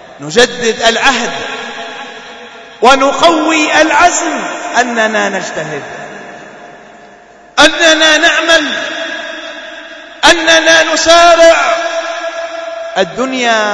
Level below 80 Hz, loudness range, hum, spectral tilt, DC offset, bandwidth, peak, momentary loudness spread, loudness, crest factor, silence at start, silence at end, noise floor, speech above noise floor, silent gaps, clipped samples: -42 dBFS; 5 LU; none; -1.5 dB/octave; under 0.1%; 11 kHz; 0 dBFS; 20 LU; -9 LUFS; 12 dB; 0 s; 0 s; -38 dBFS; 29 dB; none; 1%